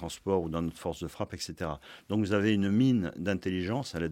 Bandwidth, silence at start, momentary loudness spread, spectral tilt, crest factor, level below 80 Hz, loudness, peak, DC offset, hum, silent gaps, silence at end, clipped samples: 16 kHz; 0 s; 12 LU; -6.5 dB/octave; 16 dB; -58 dBFS; -31 LUFS; -14 dBFS; under 0.1%; none; none; 0 s; under 0.1%